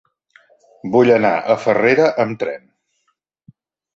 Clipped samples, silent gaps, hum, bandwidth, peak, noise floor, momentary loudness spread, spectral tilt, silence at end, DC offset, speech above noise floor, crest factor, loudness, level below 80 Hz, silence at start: under 0.1%; none; none; 7.6 kHz; -2 dBFS; -69 dBFS; 13 LU; -6.5 dB/octave; 1.4 s; under 0.1%; 54 dB; 16 dB; -16 LUFS; -60 dBFS; 0.85 s